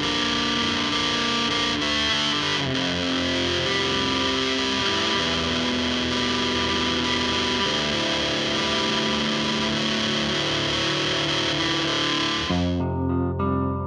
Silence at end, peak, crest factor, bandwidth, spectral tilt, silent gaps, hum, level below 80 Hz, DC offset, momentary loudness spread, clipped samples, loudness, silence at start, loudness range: 0 s; -10 dBFS; 14 dB; 10.5 kHz; -3.5 dB/octave; none; none; -44 dBFS; under 0.1%; 2 LU; under 0.1%; -22 LUFS; 0 s; 0 LU